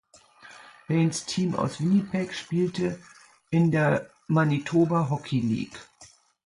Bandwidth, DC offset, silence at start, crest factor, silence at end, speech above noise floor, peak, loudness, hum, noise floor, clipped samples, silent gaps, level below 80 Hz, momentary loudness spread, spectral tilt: 11.5 kHz; under 0.1%; 0.45 s; 16 dB; 0.4 s; 30 dB; -10 dBFS; -26 LUFS; none; -55 dBFS; under 0.1%; none; -62 dBFS; 8 LU; -6.5 dB/octave